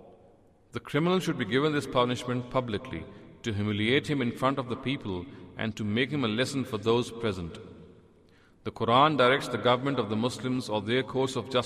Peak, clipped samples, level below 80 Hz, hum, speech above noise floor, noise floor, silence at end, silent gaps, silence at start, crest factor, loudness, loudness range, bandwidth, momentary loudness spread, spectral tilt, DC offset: -10 dBFS; under 0.1%; -60 dBFS; none; 31 dB; -59 dBFS; 0 s; none; 0 s; 20 dB; -28 LUFS; 4 LU; 15 kHz; 14 LU; -5.5 dB/octave; under 0.1%